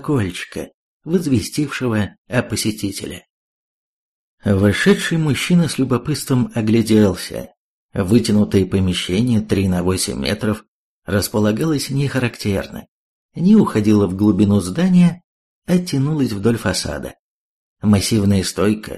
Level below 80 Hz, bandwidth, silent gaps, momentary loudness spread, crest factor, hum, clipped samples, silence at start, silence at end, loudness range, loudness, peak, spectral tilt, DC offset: -44 dBFS; 13 kHz; 0.74-1.00 s, 2.18-2.25 s, 3.30-4.38 s, 7.57-7.89 s, 10.68-11.02 s, 12.88-13.29 s, 15.24-15.62 s, 17.19-17.76 s; 14 LU; 16 dB; none; under 0.1%; 0 s; 0 s; 5 LU; -17 LUFS; -2 dBFS; -6 dB/octave; under 0.1%